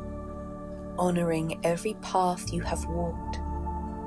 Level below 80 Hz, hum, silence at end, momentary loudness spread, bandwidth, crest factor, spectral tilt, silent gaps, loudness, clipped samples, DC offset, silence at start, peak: -40 dBFS; none; 0 s; 12 LU; 11 kHz; 18 dB; -6 dB/octave; none; -31 LUFS; under 0.1%; under 0.1%; 0 s; -12 dBFS